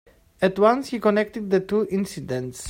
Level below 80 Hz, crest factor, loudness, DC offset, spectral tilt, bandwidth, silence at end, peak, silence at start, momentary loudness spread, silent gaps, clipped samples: -56 dBFS; 18 dB; -23 LUFS; under 0.1%; -6 dB/octave; 16 kHz; 0 s; -6 dBFS; 0.4 s; 9 LU; none; under 0.1%